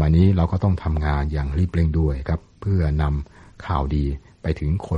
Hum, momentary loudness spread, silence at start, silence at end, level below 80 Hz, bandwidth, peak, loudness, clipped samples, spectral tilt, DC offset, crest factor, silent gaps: none; 10 LU; 0 s; 0 s; -26 dBFS; 5.6 kHz; -6 dBFS; -22 LUFS; under 0.1%; -9.5 dB/octave; under 0.1%; 14 dB; none